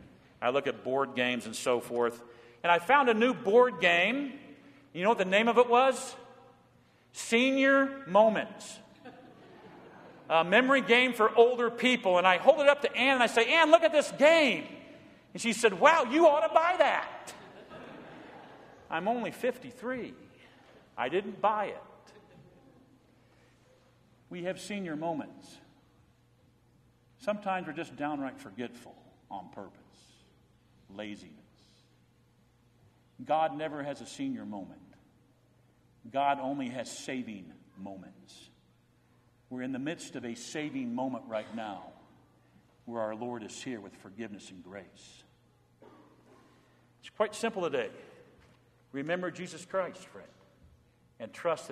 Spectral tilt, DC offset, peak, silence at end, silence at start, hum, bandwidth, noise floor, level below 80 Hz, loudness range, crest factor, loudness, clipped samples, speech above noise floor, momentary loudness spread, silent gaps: -4 dB/octave; under 0.1%; -6 dBFS; 0 s; 0.4 s; none; 15 kHz; -66 dBFS; -74 dBFS; 18 LU; 26 dB; -28 LUFS; under 0.1%; 37 dB; 24 LU; none